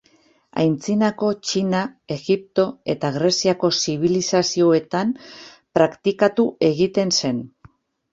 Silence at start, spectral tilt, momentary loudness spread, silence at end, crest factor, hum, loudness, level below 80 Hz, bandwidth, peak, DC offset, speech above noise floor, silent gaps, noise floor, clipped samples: 0.55 s; -4.5 dB/octave; 8 LU; 0.65 s; 18 dB; none; -20 LUFS; -60 dBFS; 8 kHz; -2 dBFS; under 0.1%; 38 dB; none; -58 dBFS; under 0.1%